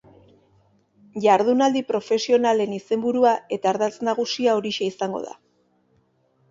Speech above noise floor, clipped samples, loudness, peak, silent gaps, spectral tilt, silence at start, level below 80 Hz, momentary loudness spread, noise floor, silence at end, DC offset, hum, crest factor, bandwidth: 43 dB; under 0.1%; -22 LUFS; -4 dBFS; none; -4.5 dB/octave; 1.15 s; -70 dBFS; 9 LU; -64 dBFS; 1.2 s; under 0.1%; none; 18 dB; 7.8 kHz